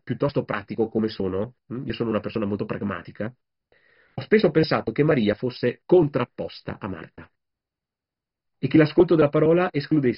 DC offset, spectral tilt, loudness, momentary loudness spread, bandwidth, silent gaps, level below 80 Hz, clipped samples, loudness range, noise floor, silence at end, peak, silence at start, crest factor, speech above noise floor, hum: under 0.1%; -6.5 dB/octave; -23 LUFS; 16 LU; 5.6 kHz; none; -54 dBFS; under 0.1%; 6 LU; -89 dBFS; 0 s; -4 dBFS; 0.05 s; 20 dB; 66 dB; none